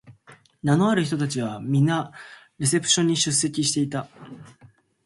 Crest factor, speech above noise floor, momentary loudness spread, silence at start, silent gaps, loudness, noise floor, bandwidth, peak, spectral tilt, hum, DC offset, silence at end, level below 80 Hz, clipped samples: 18 dB; 32 dB; 18 LU; 0.1 s; none; -22 LUFS; -55 dBFS; 11.5 kHz; -8 dBFS; -4 dB/octave; none; under 0.1%; 0.55 s; -62 dBFS; under 0.1%